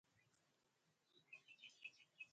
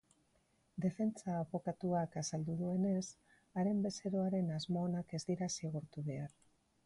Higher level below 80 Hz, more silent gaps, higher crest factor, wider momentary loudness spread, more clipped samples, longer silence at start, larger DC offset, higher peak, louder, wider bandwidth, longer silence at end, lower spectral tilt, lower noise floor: second, under -90 dBFS vs -72 dBFS; neither; first, 22 dB vs 14 dB; second, 5 LU vs 8 LU; neither; second, 0.05 s vs 0.75 s; neither; second, -44 dBFS vs -26 dBFS; second, -61 LUFS vs -39 LUFS; second, 8.4 kHz vs 11.5 kHz; second, 0 s vs 0.6 s; second, -0.5 dB/octave vs -6.5 dB/octave; first, -85 dBFS vs -76 dBFS